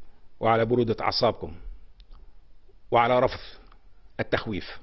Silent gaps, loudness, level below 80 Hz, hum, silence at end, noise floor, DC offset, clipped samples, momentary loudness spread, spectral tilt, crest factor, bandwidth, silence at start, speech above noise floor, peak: none; -25 LUFS; -48 dBFS; none; 0 s; -48 dBFS; under 0.1%; under 0.1%; 19 LU; -7.5 dB/octave; 20 dB; 6.2 kHz; 0 s; 23 dB; -8 dBFS